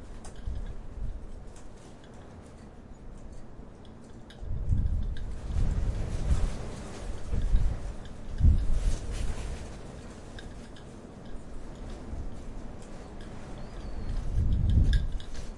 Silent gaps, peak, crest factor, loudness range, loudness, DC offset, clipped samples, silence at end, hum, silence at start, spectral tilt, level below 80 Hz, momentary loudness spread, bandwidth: none; -10 dBFS; 20 dB; 13 LU; -34 LUFS; under 0.1%; under 0.1%; 0 s; none; 0 s; -6.5 dB/octave; -32 dBFS; 20 LU; 11 kHz